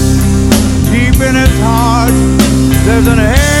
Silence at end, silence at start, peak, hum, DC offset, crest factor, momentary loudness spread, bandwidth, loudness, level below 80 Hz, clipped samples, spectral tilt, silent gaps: 0 s; 0 s; 0 dBFS; none; under 0.1%; 8 dB; 1 LU; 16.5 kHz; -9 LUFS; -14 dBFS; 1%; -5.5 dB/octave; none